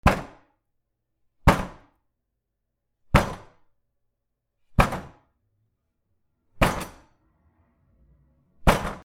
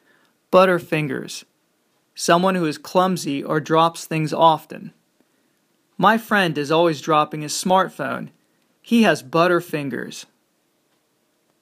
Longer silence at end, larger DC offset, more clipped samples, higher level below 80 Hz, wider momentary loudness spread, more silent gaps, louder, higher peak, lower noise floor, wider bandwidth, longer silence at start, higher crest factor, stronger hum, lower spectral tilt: second, 0.05 s vs 1.4 s; neither; neither; first, -34 dBFS vs -70 dBFS; first, 17 LU vs 14 LU; neither; second, -24 LUFS vs -19 LUFS; about the same, -2 dBFS vs 0 dBFS; first, -80 dBFS vs -66 dBFS; about the same, 16 kHz vs 15.5 kHz; second, 0.05 s vs 0.5 s; first, 26 dB vs 20 dB; neither; about the same, -5.5 dB/octave vs -5 dB/octave